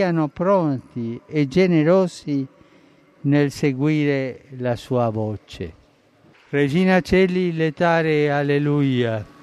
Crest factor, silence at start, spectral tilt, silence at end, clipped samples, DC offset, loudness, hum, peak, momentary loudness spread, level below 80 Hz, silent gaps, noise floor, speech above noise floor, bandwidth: 14 dB; 0 s; -7.5 dB/octave; 0.2 s; under 0.1%; under 0.1%; -20 LUFS; none; -6 dBFS; 12 LU; -50 dBFS; none; -55 dBFS; 35 dB; 12.5 kHz